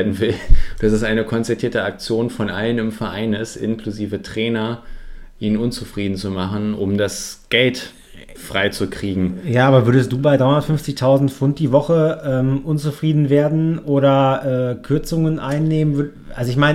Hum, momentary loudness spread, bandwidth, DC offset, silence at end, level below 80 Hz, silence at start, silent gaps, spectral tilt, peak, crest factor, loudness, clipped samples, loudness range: none; 9 LU; 15 kHz; under 0.1%; 0 s; -28 dBFS; 0 s; none; -6.5 dB/octave; 0 dBFS; 18 dB; -18 LUFS; under 0.1%; 7 LU